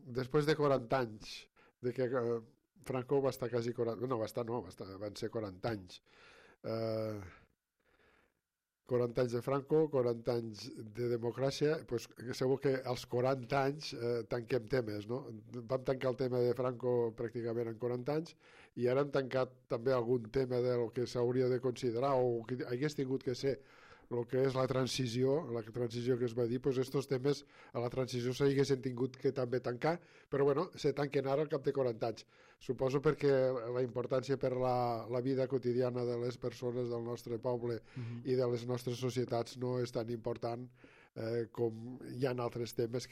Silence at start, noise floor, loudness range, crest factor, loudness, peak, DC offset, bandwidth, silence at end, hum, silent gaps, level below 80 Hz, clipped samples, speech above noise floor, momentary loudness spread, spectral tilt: 0.05 s; -89 dBFS; 5 LU; 18 dB; -36 LUFS; -18 dBFS; under 0.1%; 15 kHz; 0 s; none; none; -66 dBFS; under 0.1%; 54 dB; 10 LU; -6.5 dB/octave